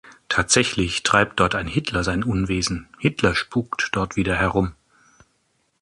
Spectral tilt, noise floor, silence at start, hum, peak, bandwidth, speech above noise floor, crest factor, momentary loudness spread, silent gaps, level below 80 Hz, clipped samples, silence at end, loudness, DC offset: -4 dB/octave; -68 dBFS; 0.05 s; none; -2 dBFS; 11.5 kHz; 46 dB; 20 dB; 7 LU; none; -40 dBFS; under 0.1%; 1.1 s; -21 LUFS; under 0.1%